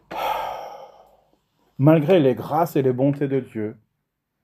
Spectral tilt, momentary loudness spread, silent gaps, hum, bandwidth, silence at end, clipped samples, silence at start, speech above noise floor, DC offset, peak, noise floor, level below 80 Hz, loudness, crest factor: -8.5 dB/octave; 15 LU; none; none; 16 kHz; 0.7 s; under 0.1%; 0.1 s; 58 dB; under 0.1%; -2 dBFS; -77 dBFS; -62 dBFS; -21 LUFS; 20 dB